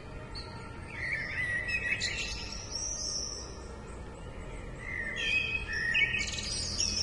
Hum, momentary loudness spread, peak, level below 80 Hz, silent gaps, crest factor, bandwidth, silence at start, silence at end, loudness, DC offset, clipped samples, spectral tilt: none; 16 LU; -16 dBFS; -46 dBFS; none; 18 dB; 11.5 kHz; 0 s; 0 s; -32 LUFS; under 0.1%; under 0.1%; -1.5 dB/octave